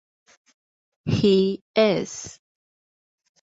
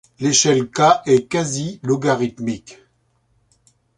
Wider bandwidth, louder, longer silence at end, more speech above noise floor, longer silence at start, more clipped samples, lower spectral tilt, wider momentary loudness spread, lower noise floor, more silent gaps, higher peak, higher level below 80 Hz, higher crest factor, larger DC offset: second, 8 kHz vs 11.5 kHz; second, -22 LUFS vs -18 LUFS; second, 1.1 s vs 1.25 s; first, over 69 dB vs 46 dB; first, 1.05 s vs 0.2 s; neither; first, -5.5 dB/octave vs -4 dB/octave; first, 16 LU vs 11 LU; first, under -90 dBFS vs -63 dBFS; first, 1.61-1.74 s vs none; second, -6 dBFS vs -2 dBFS; about the same, -54 dBFS vs -56 dBFS; about the same, 18 dB vs 18 dB; neither